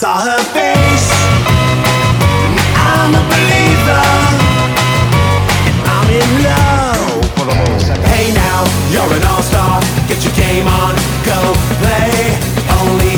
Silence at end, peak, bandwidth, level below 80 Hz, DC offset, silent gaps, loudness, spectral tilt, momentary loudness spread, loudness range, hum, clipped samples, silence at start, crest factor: 0 s; 0 dBFS; over 20 kHz; -22 dBFS; under 0.1%; none; -11 LUFS; -5 dB/octave; 4 LU; 2 LU; none; under 0.1%; 0 s; 10 dB